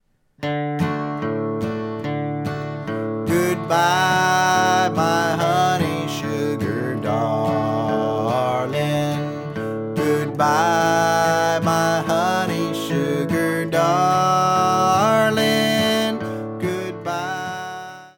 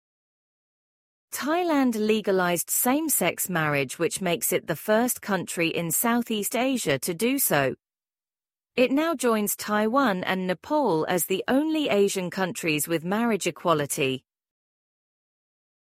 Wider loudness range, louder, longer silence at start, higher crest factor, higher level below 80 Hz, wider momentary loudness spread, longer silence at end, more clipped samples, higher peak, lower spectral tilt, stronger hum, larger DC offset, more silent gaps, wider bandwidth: about the same, 4 LU vs 2 LU; first, -20 LUFS vs -24 LUFS; second, 0.4 s vs 1.3 s; about the same, 14 dB vs 18 dB; first, -56 dBFS vs -68 dBFS; first, 10 LU vs 5 LU; second, 0.1 s vs 1.65 s; neither; about the same, -6 dBFS vs -6 dBFS; about the same, -5 dB/octave vs -4 dB/octave; neither; neither; neither; about the same, 17.5 kHz vs 16 kHz